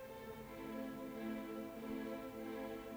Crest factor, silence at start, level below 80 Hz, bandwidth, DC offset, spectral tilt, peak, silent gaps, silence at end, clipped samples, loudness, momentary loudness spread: 14 dB; 0 s; -68 dBFS; over 20 kHz; under 0.1%; -6 dB/octave; -34 dBFS; none; 0 s; under 0.1%; -47 LUFS; 5 LU